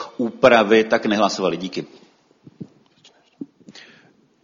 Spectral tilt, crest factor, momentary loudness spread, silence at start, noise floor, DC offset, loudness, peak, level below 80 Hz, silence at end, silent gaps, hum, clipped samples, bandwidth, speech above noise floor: -4.5 dB/octave; 20 dB; 26 LU; 0 s; -55 dBFS; under 0.1%; -17 LUFS; 0 dBFS; -60 dBFS; 0.65 s; none; none; under 0.1%; 7.6 kHz; 37 dB